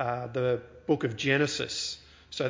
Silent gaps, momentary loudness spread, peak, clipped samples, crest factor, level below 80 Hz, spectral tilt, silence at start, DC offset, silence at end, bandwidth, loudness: none; 9 LU; -10 dBFS; under 0.1%; 20 dB; -60 dBFS; -4.5 dB/octave; 0 s; under 0.1%; 0 s; 7.6 kHz; -29 LUFS